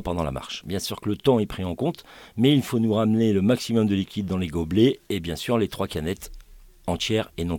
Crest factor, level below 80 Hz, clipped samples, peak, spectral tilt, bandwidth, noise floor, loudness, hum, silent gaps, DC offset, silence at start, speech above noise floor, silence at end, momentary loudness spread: 18 dB; -46 dBFS; under 0.1%; -6 dBFS; -6 dB/octave; 18 kHz; -47 dBFS; -24 LUFS; none; none; under 0.1%; 0 s; 24 dB; 0 s; 10 LU